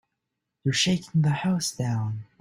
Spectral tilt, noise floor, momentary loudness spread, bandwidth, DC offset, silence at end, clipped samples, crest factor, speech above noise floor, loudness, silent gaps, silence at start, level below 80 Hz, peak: -4.5 dB/octave; -83 dBFS; 7 LU; 15.5 kHz; under 0.1%; 0.2 s; under 0.1%; 16 dB; 57 dB; -26 LUFS; none; 0.65 s; -60 dBFS; -10 dBFS